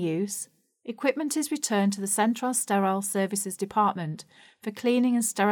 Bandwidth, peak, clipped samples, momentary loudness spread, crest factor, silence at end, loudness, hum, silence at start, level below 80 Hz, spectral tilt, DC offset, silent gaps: 20 kHz; -10 dBFS; under 0.1%; 14 LU; 16 dB; 0 s; -26 LUFS; none; 0 s; -76 dBFS; -4 dB/octave; under 0.1%; none